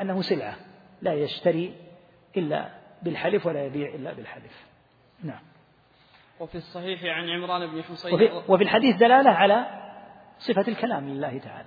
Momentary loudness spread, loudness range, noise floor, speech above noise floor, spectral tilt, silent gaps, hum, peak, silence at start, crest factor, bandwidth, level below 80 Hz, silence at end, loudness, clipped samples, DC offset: 22 LU; 15 LU; -59 dBFS; 35 dB; -8 dB/octave; none; none; -2 dBFS; 0 s; 24 dB; 5 kHz; -68 dBFS; 0.05 s; -24 LUFS; under 0.1%; under 0.1%